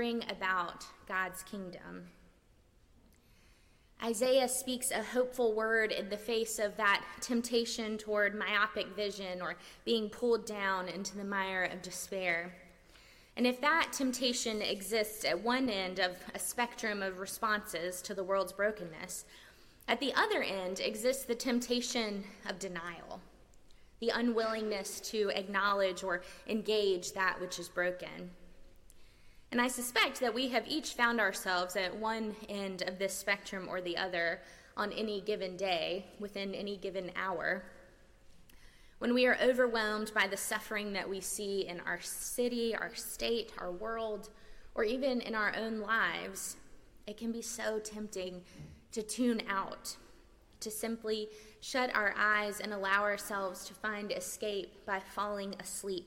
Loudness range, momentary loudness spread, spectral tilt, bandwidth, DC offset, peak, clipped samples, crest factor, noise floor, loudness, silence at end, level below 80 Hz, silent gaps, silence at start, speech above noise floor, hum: 5 LU; 12 LU; -2.5 dB/octave; 16.5 kHz; under 0.1%; -16 dBFS; under 0.1%; 20 dB; -66 dBFS; -35 LUFS; 0 s; -64 dBFS; none; 0 s; 31 dB; none